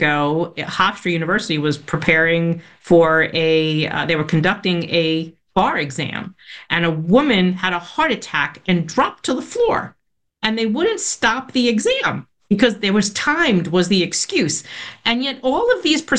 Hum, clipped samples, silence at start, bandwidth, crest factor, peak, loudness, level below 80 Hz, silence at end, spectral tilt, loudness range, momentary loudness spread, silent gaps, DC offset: none; under 0.1%; 0 s; 10 kHz; 16 dB; -2 dBFS; -18 LUFS; -50 dBFS; 0 s; -4.5 dB/octave; 3 LU; 8 LU; none; under 0.1%